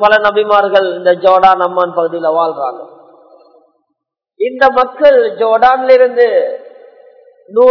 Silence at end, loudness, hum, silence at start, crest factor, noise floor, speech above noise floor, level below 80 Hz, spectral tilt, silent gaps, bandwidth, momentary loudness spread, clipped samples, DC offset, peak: 0 s; -11 LUFS; none; 0 s; 12 dB; -72 dBFS; 62 dB; -52 dBFS; -5.5 dB/octave; none; 5.4 kHz; 12 LU; 1%; under 0.1%; 0 dBFS